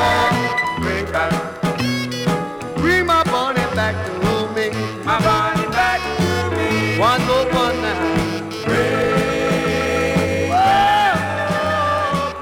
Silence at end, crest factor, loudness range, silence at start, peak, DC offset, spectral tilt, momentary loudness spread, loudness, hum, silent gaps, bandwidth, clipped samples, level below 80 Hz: 0 s; 14 dB; 2 LU; 0 s; -4 dBFS; under 0.1%; -5 dB/octave; 6 LU; -18 LUFS; none; none; 18 kHz; under 0.1%; -38 dBFS